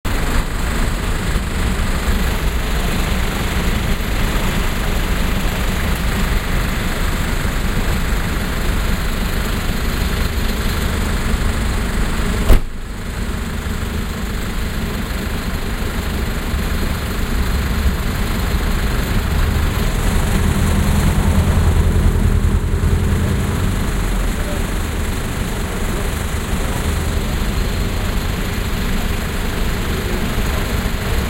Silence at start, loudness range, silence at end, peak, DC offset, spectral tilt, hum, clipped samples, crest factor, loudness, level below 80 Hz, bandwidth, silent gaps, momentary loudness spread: 0.05 s; 5 LU; 0 s; 0 dBFS; under 0.1%; -5 dB/octave; none; under 0.1%; 16 dB; -20 LUFS; -20 dBFS; 16 kHz; none; 6 LU